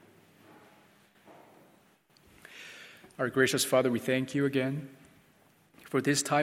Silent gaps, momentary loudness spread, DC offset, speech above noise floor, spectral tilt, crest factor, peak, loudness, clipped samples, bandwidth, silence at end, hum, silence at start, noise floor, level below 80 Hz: none; 22 LU; under 0.1%; 36 dB; -4 dB/octave; 22 dB; -12 dBFS; -29 LUFS; under 0.1%; 16.5 kHz; 0 s; none; 1.3 s; -64 dBFS; -76 dBFS